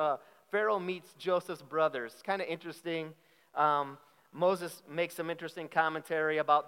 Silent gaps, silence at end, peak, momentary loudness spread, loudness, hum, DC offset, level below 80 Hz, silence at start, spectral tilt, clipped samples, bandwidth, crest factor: none; 0 s; -12 dBFS; 10 LU; -33 LUFS; none; under 0.1%; under -90 dBFS; 0 s; -5 dB/octave; under 0.1%; 16.5 kHz; 20 dB